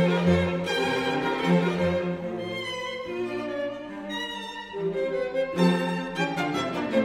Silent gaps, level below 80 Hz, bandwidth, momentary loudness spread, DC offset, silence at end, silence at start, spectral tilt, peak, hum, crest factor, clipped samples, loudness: none; -54 dBFS; 12 kHz; 9 LU; under 0.1%; 0 s; 0 s; -6 dB/octave; -10 dBFS; none; 16 dB; under 0.1%; -27 LUFS